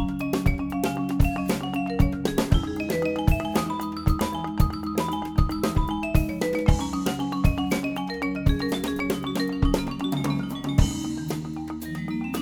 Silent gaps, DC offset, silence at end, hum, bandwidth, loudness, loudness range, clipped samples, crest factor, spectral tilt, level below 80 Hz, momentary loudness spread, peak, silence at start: none; under 0.1%; 0 s; none; over 20 kHz; -26 LUFS; 1 LU; under 0.1%; 20 dB; -6 dB/octave; -30 dBFS; 5 LU; -4 dBFS; 0 s